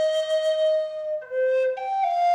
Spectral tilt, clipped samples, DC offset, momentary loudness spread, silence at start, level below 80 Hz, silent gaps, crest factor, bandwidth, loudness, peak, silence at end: 0.5 dB/octave; under 0.1%; under 0.1%; 7 LU; 0 s; -76 dBFS; none; 8 dB; 11 kHz; -24 LUFS; -16 dBFS; 0 s